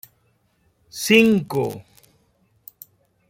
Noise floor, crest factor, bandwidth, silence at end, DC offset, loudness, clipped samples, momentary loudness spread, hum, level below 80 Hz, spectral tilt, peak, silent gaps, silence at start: -64 dBFS; 22 dB; 16.5 kHz; 1.5 s; under 0.1%; -18 LUFS; under 0.1%; 27 LU; none; -60 dBFS; -4.5 dB/octave; -2 dBFS; none; 0.95 s